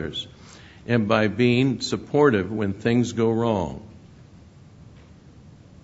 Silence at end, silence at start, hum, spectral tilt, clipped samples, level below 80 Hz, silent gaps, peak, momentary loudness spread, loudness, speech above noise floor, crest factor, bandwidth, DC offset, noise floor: 0.95 s; 0 s; none; -6.5 dB/octave; under 0.1%; -52 dBFS; none; -4 dBFS; 13 LU; -22 LUFS; 26 dB; 20 dB; 8 kHz; under 0.1%; -48 dBFS